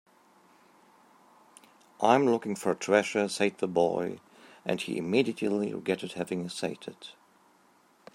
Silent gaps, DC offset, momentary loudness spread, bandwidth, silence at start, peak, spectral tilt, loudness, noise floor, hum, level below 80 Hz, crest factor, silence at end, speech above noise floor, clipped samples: none; under 0.1%; 14 LU; 16 kHz; 2 s; -8 dBFS; -5 dB/octave; -29 LUFS; -63 dBFS; none; -76 dBFS; 24 dB; 1.05 s; 35 dB; under 0.1%